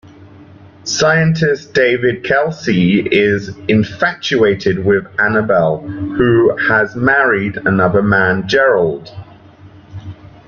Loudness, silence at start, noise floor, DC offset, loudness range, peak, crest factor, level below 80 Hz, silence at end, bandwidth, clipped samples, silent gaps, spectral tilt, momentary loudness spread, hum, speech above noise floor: -13 LUFS; 0.2 s; -40 dBFS; under 0.1%; 2 LU; 0 dBFS; 14 dB; -46 dBFS; 0.2 s; 7.4 kHz; under 0.1%; none; -5.5 dB/octave; 9 LU; none; 27 dB